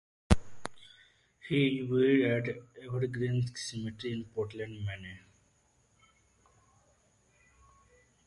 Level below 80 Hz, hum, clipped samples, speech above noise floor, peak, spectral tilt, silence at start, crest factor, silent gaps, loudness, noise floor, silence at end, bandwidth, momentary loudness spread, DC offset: -46 dBFS; none; under 0.1%; 38 dB; -8 dBFS; -6.5 dB/octave; 0.3 s; 28 dB; none; -32 LUFS; -70 dBFS; 3.1 s; 11.5 kHz; 19 LU; under 0.1%